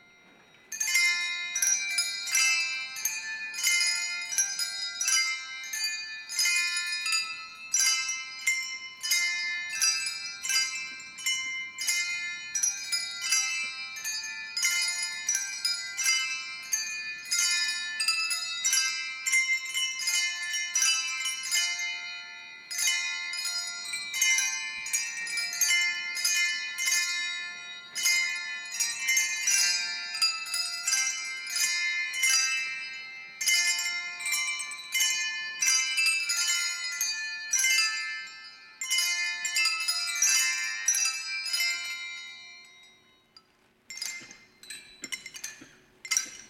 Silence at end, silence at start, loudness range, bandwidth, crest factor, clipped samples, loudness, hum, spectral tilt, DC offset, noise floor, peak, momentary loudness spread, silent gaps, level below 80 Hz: 0 s; 0.7 s; 3 LU; 17 kHz; 22 dB; under 0.1%; -27 LUFS; none; 4.5 dB/octave; under 0.1%; -65 dBFS; -10 dBFS; 12 LU; none; -80 dBFS